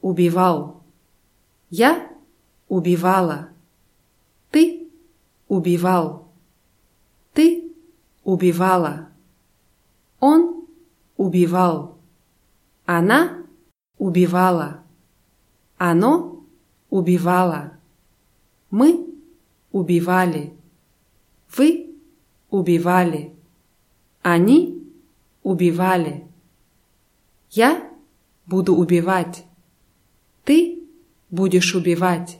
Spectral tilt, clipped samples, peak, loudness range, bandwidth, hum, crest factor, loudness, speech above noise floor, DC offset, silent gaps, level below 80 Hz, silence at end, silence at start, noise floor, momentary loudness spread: -6.5 dB/octave; under 0.1%; -2 dBFS; 2 LU; 16 kHz; none; 18 dB; -19 LUFS; 45 dB; under 0.1%; none; -64 dBFS; 0.05 s; 0.05 s; -62 dBFS; 15 LU